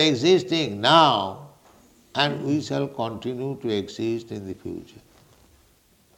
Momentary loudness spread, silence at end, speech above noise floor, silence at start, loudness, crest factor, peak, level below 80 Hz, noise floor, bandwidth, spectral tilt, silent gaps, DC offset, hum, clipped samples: 18 LU; 1.35 s; 37 dB; 0 s; -23 LUFS; 20 dB; -4 dBFS; -64 dBFS; -60 dBFS; 15.5 kHz; -5 dB/octave; none; under 0.1%; none; under 0.1%